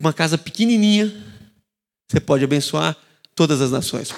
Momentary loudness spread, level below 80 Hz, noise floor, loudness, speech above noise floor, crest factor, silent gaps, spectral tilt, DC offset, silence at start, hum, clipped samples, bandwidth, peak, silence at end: 9 LU; -56 dBFS; -72 dBFS; -19 LUFS; 54 dB; 18 dB; none; -5 dB/octave; under 0.1%; 0 s; none; under 0.1%; 15 kHz; 0 dBFS; 0 s